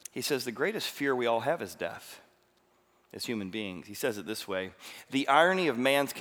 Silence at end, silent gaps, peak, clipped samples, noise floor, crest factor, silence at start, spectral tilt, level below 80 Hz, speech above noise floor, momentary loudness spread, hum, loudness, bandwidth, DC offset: 0 s; none; -8 dBFS; under 0.1%; -68 dBFS; 22 dB; 0.15 s; -3.5 dB/octave; -80 dBFS; 38 dB; 15 LU; 60 Hz at -70 dBFS; -30 LUFS; over 20 kHz; under 0.1%